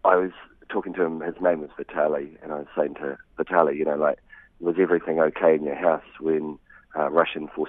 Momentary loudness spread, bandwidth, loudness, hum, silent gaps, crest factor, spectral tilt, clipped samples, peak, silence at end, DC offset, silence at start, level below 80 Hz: 13 LU; 3.9 kHz; -25 LUFS; none; none; 20 dB; -9.5 dB/octave; under 0.1%; -4 dBFS; 0 s; under 0.1%; 0.05 s; -60 dBFS